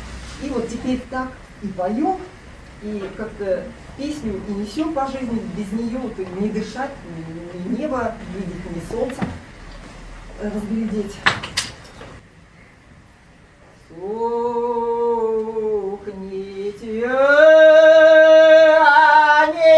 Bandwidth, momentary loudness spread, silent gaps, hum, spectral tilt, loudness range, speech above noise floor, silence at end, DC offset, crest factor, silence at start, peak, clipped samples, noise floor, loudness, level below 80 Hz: 11 kHz; 22 LU; none; none; -5 dB/octave; 15 LU; 24 dB; 0 s; under 0.1%; 18 dB; 0 s; 0 dBFS; under 0.1%; -48 dBFS; -16 LUFS; -44 dBFS